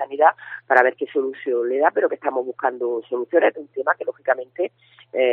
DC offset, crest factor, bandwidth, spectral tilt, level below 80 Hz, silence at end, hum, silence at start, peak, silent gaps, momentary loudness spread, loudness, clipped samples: under 0.1%; 20 dB; 4.4 kHz; -1 dB/octave; -82 dBFS; 0 s; none; 0 s; 0 dBFS; none; 9 LU; -21 LUFS; under 0.1%